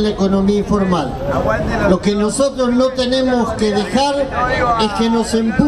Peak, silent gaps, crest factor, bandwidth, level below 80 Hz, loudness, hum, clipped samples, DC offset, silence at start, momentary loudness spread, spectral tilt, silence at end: 0 dBFS; none; 14 dB; 13 kHz; -32 dBFS; -16 LUFS; none; under 0.1%; under 0.1%; 0 s; 2 LU; -5.5 dB/octave; 0 s